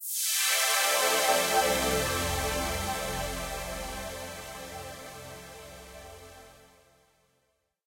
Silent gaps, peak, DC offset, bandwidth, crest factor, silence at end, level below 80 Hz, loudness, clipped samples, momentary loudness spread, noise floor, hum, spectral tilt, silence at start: none; -12 dBFS; under 0.1%; 16.5 kHz; 20 dB; 1.3 s; -46 dBFS; -27 LUFS; under 0.1%; 22 LU; -75 dBFS; none; -1.5 dB/octave; 0 s